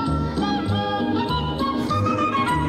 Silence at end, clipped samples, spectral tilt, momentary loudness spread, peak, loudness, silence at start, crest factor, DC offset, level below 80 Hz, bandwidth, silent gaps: 0 s; under 0.1%; -6.5 dB/octave; 3 LU; -10 dBFS; -23 LUFS; 0 s; 12 dB; under 0.1%; -36 dBFS; 13 kHz; none